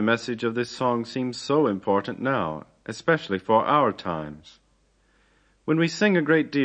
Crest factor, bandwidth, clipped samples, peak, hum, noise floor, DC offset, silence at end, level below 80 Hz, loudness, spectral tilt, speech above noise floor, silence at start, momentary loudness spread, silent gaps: 18 dB; 9.6 kHz; under 0.1%; -6 dBFS; none; -64 dBFS; under 0.1%; 0 s; -62 dBFS; -24 LUFS; -6 dB/octave; 40 dB; 0 s; 11 LU; none